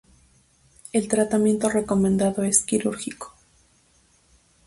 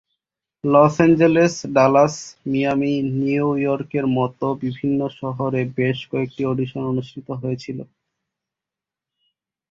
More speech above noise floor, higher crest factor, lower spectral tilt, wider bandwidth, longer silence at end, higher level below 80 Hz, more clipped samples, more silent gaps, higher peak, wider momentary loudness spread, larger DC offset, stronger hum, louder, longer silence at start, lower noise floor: second, 39 dB vs 69 dB; about the same, 20 dB vs 18 dB; second, -5 dB/octave vs -7 dB/octave; first, 11.5 kHz vs 7.8 kHz; second, 1.4 s vs 1.85 s; about the same, -54 dBFS vs -56 dBFS; neither; neither; about the same, -4 dBFS vs -2 dBFS; about the same, 13 LU vs 12 LU; neither; neither; about the same, -22 LUFS vs -20 LUFS; first, 0.95 s vs 0.65 s; second, -61 dBFS vs -88 dBFS